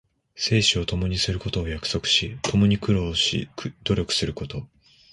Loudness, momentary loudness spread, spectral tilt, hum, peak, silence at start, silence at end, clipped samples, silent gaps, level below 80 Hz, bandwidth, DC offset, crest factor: -23 LUFS; 10 LU; -4.5 dB/octave; none; -8 dBFS; 0.35 s; 0.45 s; under 0.1%; none; -38 dBFS; 11.5 kHz; under 0.1%; 18 dB